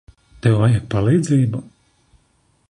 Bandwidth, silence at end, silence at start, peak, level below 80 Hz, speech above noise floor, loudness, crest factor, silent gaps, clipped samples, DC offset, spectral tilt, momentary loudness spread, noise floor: 11 kHz; 1.05 s; 0.45 s; -4 dBFS; -44 dBFS; 45 dB; -18 LUFS; 16 dB; none; under 0.1%; under 0.1%; -7.5 dB/octave; 6 LU; -61 dBFS